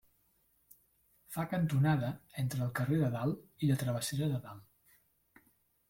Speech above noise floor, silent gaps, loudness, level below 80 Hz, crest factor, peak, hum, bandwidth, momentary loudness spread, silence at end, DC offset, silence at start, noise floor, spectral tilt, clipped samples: 40 dB; none; -34 LUFS; -64 dBFS; 18 dB; -18 dBFS; none; 16.5 kHz; 10 LU; 1.3 s; under 0.1%; 1.3 s; -73 dBFS; -6.5 dB/octave; under 0.1%